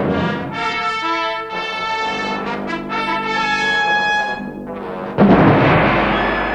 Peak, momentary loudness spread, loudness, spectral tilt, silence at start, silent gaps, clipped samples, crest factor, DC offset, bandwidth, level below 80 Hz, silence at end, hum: 0 dBFS; 12 LU; -17 LUFS; -6 dB/octave; 0 s; none; under 0.1%; 16 dB; under 0.1%; 9.8 kHz; -38 dBFS; 0 s; none